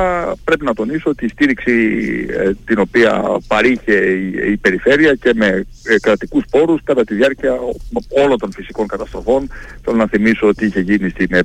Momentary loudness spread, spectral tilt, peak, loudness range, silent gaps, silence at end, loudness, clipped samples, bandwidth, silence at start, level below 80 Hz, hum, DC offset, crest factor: 8 LU; -6.5 dB/octave; -2 dBFS; 3 LU; none; 0 s; -15 LUFS; under 0.1%; 11.5 kHz; 0 s; -36 dBFS; none; under 0.1%; 12 dB